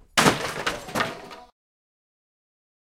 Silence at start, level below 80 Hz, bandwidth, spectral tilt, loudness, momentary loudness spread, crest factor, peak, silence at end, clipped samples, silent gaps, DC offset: 0.15 s; -52 dBFS; 16.5 kHz; -3 dB/octave; -24 LUFS; 23 LU; 28 dB; -2 dBFS; 1.5 s; under 0.1%; none; under 0.1%